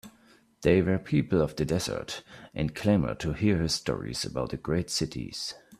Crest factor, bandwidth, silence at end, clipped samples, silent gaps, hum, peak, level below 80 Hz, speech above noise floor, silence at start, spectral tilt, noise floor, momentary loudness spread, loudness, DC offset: 20 dB; 15 kHz; 0.05 s; under 0.1%; none; none; -10 dBFS; -48 dBFS; 32 dB; 0.05 s; -5.5 dB/octave; -60 dBFS; 10 LU; -28 LUFS; under 0.1%